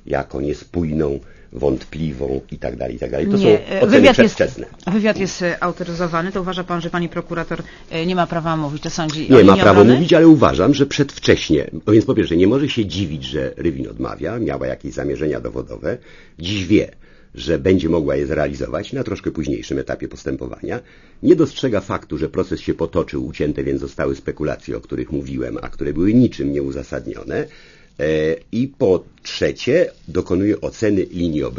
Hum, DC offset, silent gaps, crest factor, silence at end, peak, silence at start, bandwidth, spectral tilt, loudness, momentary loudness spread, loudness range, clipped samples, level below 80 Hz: none; under 0.1%; none; 18 dB; 0 s; 0 dBFS; 0.05 s; 7.4 kHz; -6.5 dB/octave; -18 LUFS; 15 LU; 10 LU; under 0.1%; -38 dBFS